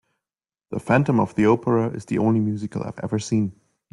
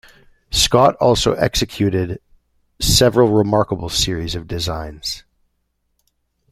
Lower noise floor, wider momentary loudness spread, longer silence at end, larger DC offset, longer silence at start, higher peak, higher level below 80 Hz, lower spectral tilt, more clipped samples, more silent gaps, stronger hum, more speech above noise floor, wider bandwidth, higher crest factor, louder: first, under -90 dBFS vs -69 dBFS; about the same, 11 LU vs 13 LU; second, 0.4 s vs 1.3 s; neither; first, 0.7 s vs 0.5 s; second, -4 dBFS vs 0 dBFS; second, -58 dBFS vs -34 dBFS; first, -7.5 dB/octave vs -4 dB/octave; neither; neither; neither; first, over 69 dB vs 52 dB; second, 11.5 kHz vs 16 kHz; about the same, 18 dB vs 18 dB; second, -22 LUFS vs -17 LUFS